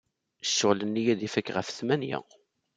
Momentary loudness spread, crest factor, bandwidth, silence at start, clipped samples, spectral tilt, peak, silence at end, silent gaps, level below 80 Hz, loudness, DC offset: 10 LU; 22 dB; 9.6 kHz; 0.45 s; under 0.1%; -4 dB/octave; -8 dBFS; 0.55 s; none; -74 dBFS; -28 LUFS; under 0.1%